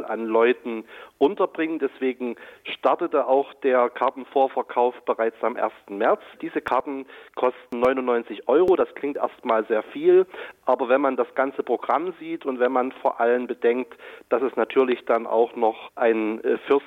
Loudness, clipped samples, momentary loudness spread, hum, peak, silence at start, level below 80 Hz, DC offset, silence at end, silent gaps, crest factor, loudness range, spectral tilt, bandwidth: -23 LUFS; under 0.1%; 9 LU; none; -8 dBFS; 0 s; -66 dBFS; under 0.1%; 0 s; none; 14 dB; 3 LU; -6.5 dB/octave; 5 kHz